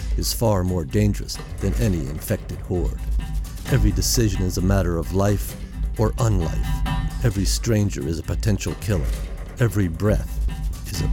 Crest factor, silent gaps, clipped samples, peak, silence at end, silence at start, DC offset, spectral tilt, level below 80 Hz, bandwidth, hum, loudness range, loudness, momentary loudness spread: 16 dB; none; under 0.1%; -6 dBFS; 0 s; 0 s; under 0.1%; -5.5 dB/octave; -26 dBFS; 17 kHz; none; 2 LU; -23 LUFS; 8 LU